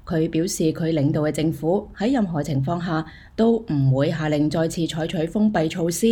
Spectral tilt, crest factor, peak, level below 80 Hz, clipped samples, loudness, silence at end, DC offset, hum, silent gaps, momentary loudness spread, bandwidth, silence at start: -6.5 dB/octave; 14 dB; -8 dBFS; -46 dBFS; under 0.1%; -22 LUFS; 0 s; under 0.1%; none; none; 4 LU; over 20 kHz; 0.05 s